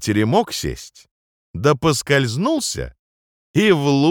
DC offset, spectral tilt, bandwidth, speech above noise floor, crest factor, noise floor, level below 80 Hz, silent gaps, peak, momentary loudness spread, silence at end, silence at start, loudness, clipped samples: under 0.1%; -5 dB/octave; 19.5 kHz; over 72 dB; 16 dB; under -90 dBFS; -44 dBFS; 1.11-1.54 s, 2.99-3.54 s; -2 dBFS; 13 LU; 0 s; 0 s; -18 LUFS; under 0.1%